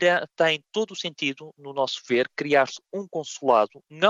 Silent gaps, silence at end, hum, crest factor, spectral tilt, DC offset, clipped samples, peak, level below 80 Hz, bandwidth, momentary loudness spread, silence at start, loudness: none; 0 s; none; 20 dB; -3.5 dB/octave; under 0.1%; under 0.1%; -6 dBFS; -76 dBFS; 8.2 kHz; 11 LU; 0 s; -25 LUFS